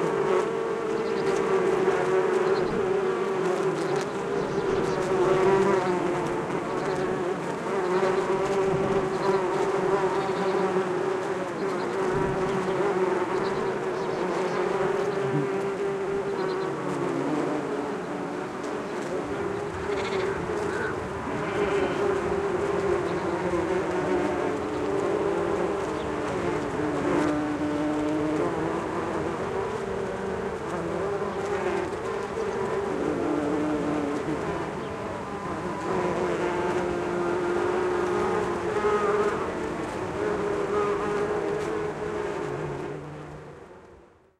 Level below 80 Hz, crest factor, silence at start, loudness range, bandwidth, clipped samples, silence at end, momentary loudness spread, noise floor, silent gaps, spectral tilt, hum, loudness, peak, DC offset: -52 dBFS; 16 dB; 0 s; 4 LU; 12 kHz; under 0.1%; 0.4 s; 6 LU; -53 dBFS; none; -6 dB/octave; none; -27 LUFS; -10 dBFS; under 0.1%